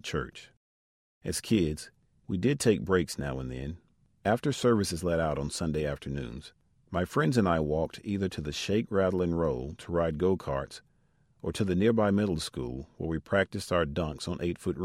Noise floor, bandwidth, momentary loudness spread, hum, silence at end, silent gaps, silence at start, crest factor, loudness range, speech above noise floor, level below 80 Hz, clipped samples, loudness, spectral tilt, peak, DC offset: -68 dBFS; 16 kHz; 13 LU; none; 0 s; 0.57-1.21 s; 0.05 s; 20 dB; 2 LU; 39 dB; -48 dBFS; under 0.1%; -30 LUFS; -6 dB/octave; -10 dBFS; under 0.1%